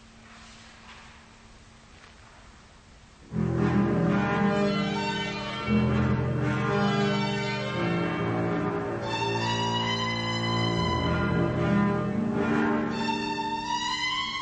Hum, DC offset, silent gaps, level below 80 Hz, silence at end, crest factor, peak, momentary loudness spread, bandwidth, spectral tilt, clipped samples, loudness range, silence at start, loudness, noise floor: none; under 0.1%; none; -48 dBFS; 0 s; 14 dB; -14 dBFS; 6 LU; 8.8 kHz; -6 dB/octave; under 0.1%; 3 LU; 0 s; -27 LUFS; -52 dBFS